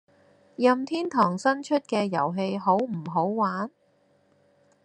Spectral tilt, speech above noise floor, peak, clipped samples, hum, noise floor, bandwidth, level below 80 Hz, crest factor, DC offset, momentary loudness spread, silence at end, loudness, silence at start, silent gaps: -6 dB/octave; 40 dB; -6 dBFS; under 0.1%; none; -65 dBFS; 9.8 kHz; -76 dBFS; 20 dB; under 0.1%; 5 LU; 1.15 s; -26 LUFS; 0.6 s; none